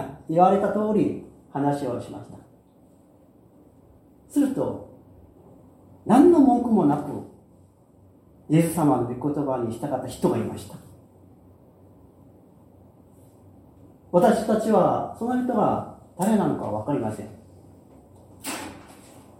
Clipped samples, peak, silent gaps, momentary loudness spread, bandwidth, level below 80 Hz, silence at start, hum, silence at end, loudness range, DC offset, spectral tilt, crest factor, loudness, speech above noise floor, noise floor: under 0.1%; -4 dBFS; none; 20 LU; 16.5 kHz; -58 dBFS; 0 s; none; 0.55 s; 10 LU; under 0.1%; -7.5 dB/octave; 22 dB; -23 LUFS; 33 dB; -55 dBFS